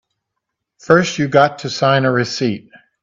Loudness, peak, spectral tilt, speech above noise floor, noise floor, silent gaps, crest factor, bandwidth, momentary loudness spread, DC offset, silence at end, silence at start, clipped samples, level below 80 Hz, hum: -15 LUFS; 0 dBFS; -5.5 dB/octave; 62 dB; -77 dBFS; none; 16 dB; 7.8 kHz; 7 LU; under 0.1%; 0.45 s; 0.85 s; under 0.1%; -58 dBFS; none